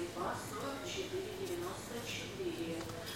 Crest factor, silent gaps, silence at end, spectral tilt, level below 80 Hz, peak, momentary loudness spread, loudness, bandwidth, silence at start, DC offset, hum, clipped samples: 16 dB; none; 0 s; -4 dB/octave; -62 dBFS; -26 dBFS; 2 LU; -41 LUFS; 16.5 kHz; 0 s; under 0.1%; none; under 0.1%